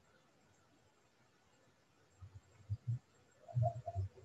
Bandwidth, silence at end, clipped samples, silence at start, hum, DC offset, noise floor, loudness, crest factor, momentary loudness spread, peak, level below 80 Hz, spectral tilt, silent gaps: 8 kHz; 0.05 s; under 0.1%; 2.2 s; none; under 0.1%; -73 dBFS; -43 LUFS; 20 dB; 22 LU; -26 dBFS; -62 dBFS; -9 dB/octave; none